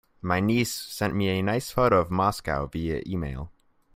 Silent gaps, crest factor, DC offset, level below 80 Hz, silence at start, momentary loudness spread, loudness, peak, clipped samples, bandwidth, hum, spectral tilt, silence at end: none; 18 dB; under 0.1%; -46 dBFS; 0.25 s; 10 LU; -26 LUFS; -8 dBFS; under 0.1%; 16 kHz; none; -5.5 dB/octave; 0.45 s